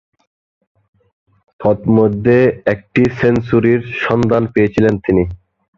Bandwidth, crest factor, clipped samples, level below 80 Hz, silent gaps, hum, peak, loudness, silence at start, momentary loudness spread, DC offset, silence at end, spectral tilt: 7.4 kHz; 14 dB; under 0.1%; -40 dBFS; none; none; -2 dBFS; -14 LUFS; 1.6 s; 5 LU; under 0.1%; 0.4 s; -8.5 dB/octave